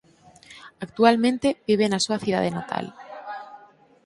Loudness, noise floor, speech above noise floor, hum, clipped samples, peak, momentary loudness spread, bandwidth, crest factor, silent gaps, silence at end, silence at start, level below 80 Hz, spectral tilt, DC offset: -22 LUFS; -52 dBFS; 30 dB; none; under 0.1%; -2 dBFS; 21 LU; 11.5 kHz; 22 dB; none; 0.5 s; 0.5 s; -62 dBFS; -4.5 dB/octave; under 0.1%